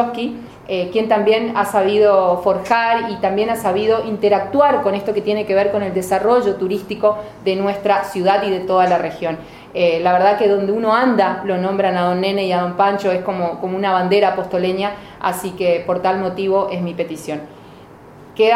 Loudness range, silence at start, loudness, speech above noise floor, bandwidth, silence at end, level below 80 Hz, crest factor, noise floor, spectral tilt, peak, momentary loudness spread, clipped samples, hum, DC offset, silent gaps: 3 LU; 0 s; -17 LUFS; 24 dB; 16 kHz; 0 s; -54 dBFS; 16 dB; -40 dBFS; -5.5 dB/octave; 0 dBFS; 9 LU; under 0.1%; none; under 0.1%; none